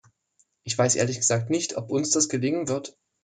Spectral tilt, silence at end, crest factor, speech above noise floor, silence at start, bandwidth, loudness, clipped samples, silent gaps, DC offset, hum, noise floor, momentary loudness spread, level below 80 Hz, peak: -3.5 dB/octave; 0.35 s; 18 dB; 43 dB; 0.65 s; 9.6 kHz; -24 LUFS; under 0.1%; none; under 0.1%; none; -68 dBFS; 9 LU; -68 dBFS; -8 dBFS